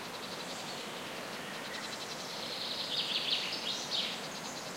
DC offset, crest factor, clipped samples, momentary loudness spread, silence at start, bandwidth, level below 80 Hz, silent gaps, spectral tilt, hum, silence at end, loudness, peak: under 0.1%; 20 dB; under 0.1%; 9 LU; 0 s; 16 kHz; -78 dBFS; none; -1.5 dB/octave; none; 0 s; -36 LUFS; -20 dBFS